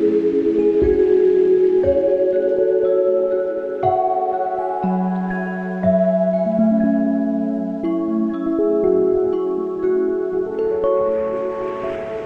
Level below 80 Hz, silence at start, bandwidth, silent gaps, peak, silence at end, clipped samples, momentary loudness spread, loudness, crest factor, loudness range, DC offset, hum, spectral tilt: -44 dBFS; 0 s; 4.7 kHz; none; -6 dBFS; 0 s; under 0.1%; 8 LU; -18 LUFS; 12 dB; 4 LU; under 0.1%; none; -10 dB/octave